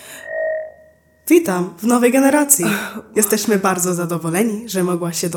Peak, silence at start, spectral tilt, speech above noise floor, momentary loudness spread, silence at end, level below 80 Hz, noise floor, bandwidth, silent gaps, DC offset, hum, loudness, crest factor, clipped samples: 0 dBFS; 0 s; -4 dB/octave; 34 dB; 10 LU; 0 s; -64 dBFS; -50 dBFS; 18 kHz; none; under 0.1%; none; -17 LUFS; 18 dB; under 0.1%